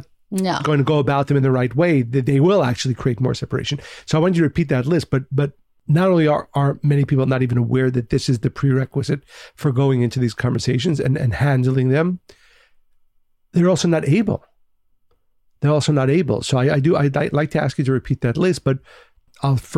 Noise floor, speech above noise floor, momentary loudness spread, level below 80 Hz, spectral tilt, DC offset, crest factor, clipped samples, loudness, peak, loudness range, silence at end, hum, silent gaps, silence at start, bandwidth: -60 dBFS; 42 dB; 7 LU; -46 dBFS; -7 dB/octave; under 0.1%; 12 dB; under 0.1%; -19 LUFS; -6 dBFS; 3 LU; 0 s; none; none; 0.3 s; 11 kHz